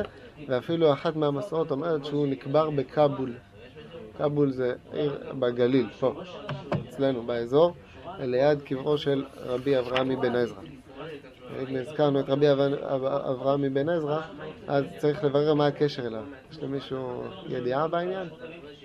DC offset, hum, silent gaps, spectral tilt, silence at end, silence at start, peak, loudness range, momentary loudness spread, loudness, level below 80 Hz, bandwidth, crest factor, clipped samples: under 0.1%; none; none; -8 dB/octave; 0.05 s; 0 s; -8 dBFS; 2 LU; 17 LU; -27 LUFS; -60 dBFS; 11 kHz; 18 dB; under 0.1%